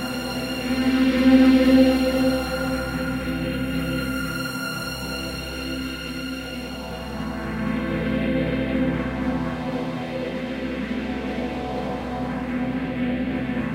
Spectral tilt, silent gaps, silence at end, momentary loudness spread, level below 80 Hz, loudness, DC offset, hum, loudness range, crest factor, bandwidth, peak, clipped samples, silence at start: -6 dB/octave; none; 0 s; 13 LU; -38 dBFS; -24 LUFS; under 0.1%; none; 9 LU; 18 dB; 16 kHz; -4 dBFS; under 0.1%; 0 s